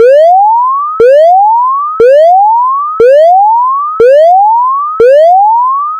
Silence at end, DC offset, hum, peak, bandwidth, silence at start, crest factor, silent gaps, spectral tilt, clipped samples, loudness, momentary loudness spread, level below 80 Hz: 0 s; under 0.1%; none; 0 dBFS; 9 kHz; 0 s; 4 dB; none; -4.5 dB/octave; 7%; -5 LUFS; 5 LU; -48 dBFS